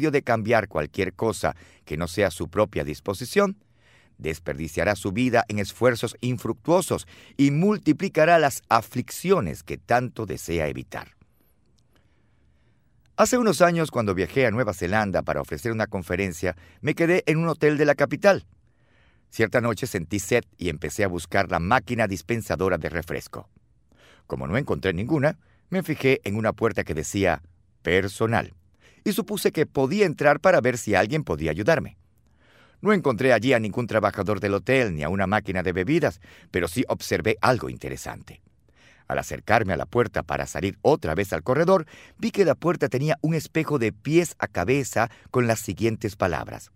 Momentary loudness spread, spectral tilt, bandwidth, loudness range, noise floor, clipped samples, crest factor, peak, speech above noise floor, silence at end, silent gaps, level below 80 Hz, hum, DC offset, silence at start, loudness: 10 LU; -5.5 dB/octave; 16 kHz; 5 LU; -64 dBFS; under 0.1%; 22 dB; -2 dBFS; 40 dB; 0.1 s; none; -50 dBFS; none; under 0.1%; 0 s; -24 LUFS